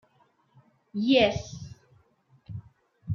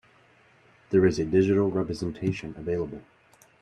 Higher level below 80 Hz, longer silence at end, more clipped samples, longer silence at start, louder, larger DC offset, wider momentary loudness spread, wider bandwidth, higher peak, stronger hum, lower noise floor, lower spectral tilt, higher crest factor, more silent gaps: about the same, -56 dBFS vs -54 dBFS; second, 0 s vs 0.6 s; neither; about the same, 0.95 s vs 0.9 s; about the same, -25 LUFS vs -26 LUFS; neither; first, 24 LU vs 11 LU; second, 7.2 kHz vs 9.6 kHz; about the same, -8 dBFS vs -8 dBFS; neither; first, -66 dBFS vs -59 dBFS; second, -5.5 dB/octave vs -7.5 dB/octave; about the same, 22 dB vs 18 dB; neither